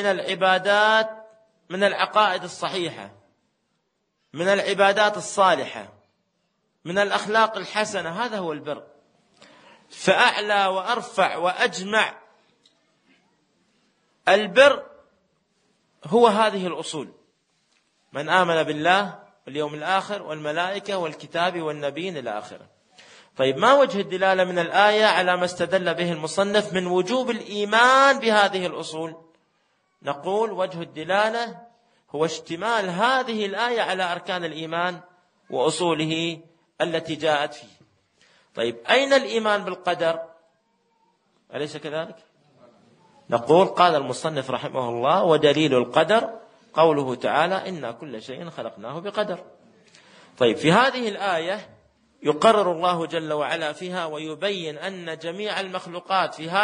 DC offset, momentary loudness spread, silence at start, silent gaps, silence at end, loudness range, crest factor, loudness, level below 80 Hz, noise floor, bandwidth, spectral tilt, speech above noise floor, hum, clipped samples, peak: under 0.1%; 15 LU; 0 s; none; 0 s; 7 LU; 22 dB; -22 LUFS; -72 dBFS; -73 dBFS; 10 kHz; -4 dB/octave; 51 dB; none; under 0.1%; -2 dBFS